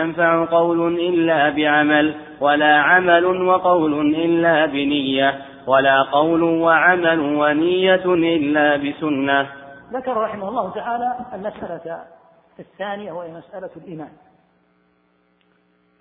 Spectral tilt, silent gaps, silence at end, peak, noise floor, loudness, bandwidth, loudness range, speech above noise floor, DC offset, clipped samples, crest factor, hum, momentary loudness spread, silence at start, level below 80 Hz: -9 dB/octave; none; 1.9 s; 0 dBFS; -62 dBFS; -17 LUFS; 4 kHz; 18 LU; 44 dB; under 0.1%; under 0.1%; 18 dB; none; 17 LU; 0 s; -58 dBFS